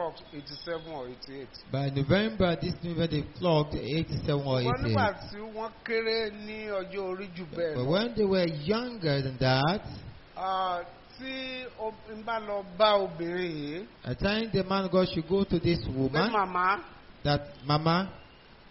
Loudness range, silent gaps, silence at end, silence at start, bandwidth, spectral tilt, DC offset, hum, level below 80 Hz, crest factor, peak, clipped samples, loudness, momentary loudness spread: 3 LU; none; 0.35 s; 0 s; 6 kHz; -4.5 dB/octave; under 0.1%; none; -50 dBFS; 20 dB; -10 dBFS; under 0.1%; -30 LUFS; 13 LU